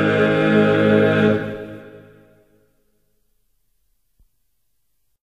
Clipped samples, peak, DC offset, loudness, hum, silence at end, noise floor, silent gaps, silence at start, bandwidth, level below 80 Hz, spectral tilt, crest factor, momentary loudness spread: under 0.1%; -4 dBFS; under 0.1%; -16 LUFS; none; 3.25 s; -73 dBFS; none; 0 s; 8.8 kHz; -54 dBFS; -8 dB/octave; 18 dB; 19 LU